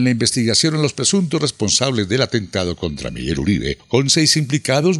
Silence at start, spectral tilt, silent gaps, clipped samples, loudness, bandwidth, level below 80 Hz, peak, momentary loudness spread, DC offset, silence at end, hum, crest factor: 0 s; -4 dB/octave; none; under 0.1%; -17 LUFS; 13 kHz; -42 dBFS; 0 dBFS; 9 LU; under 0.1%; 0 s; none; 16 dB